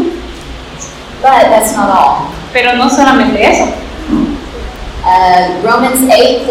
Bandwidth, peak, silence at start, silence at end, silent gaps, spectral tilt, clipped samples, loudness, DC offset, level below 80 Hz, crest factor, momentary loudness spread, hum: 17 kHz; 0 dBFS; 0 s; 0 s; none; -3.5 dB/octave; 1%; -9 LUFS; under 0.1%; -30 dBFS; 10 dB; 18 LU; none